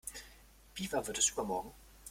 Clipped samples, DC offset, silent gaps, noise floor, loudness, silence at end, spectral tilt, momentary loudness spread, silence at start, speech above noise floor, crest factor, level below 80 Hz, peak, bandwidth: under 0.1%; under 0.1%; none; -59 dBFS; -35 LUFS; 0 s; -2 dB/octave; 21 LU; 0.05 s; 23 dB; 22 dB; -60 dBFS; -18 dBFS; 16.5 kHz